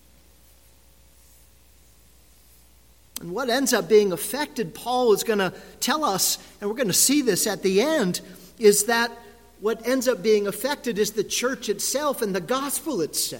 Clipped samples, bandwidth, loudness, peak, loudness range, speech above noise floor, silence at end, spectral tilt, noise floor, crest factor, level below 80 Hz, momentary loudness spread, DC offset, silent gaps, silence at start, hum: under 0.1%; 17 kHz; -23 LUFS; -6 dBFS; 4 LU; 33 dB; 0 s; -3 dB/octave; -55 dBFS; 20 dB; -58 dBFS; 10 LU; 0.1%; none; 3.15 s; none